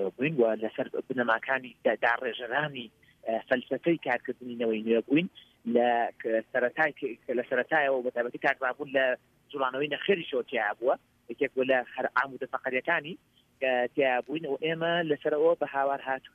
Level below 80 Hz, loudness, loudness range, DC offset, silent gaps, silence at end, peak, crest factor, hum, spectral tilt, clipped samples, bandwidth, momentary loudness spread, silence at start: -76 dBFS; -29 LUFS; 2 LU; under 0.1%; none; 0.05 s; -10 dBFS; 18 dB; none; -7 dB/octave; under 0.1%; 6.6 kHz; 8 LU; 0 s